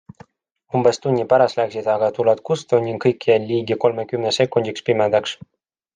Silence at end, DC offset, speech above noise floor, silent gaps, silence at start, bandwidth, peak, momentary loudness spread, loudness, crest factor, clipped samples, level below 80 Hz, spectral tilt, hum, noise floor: 0.6 s; under 0.1%; 43 dB; none; 0.75 s; 9.6 kHz; -2 dBFS; 5 LU; -19 LUFS; 16 dB; under 0.1%; -64 dBFS; -5.5 dB/octave; none; -61 dBFS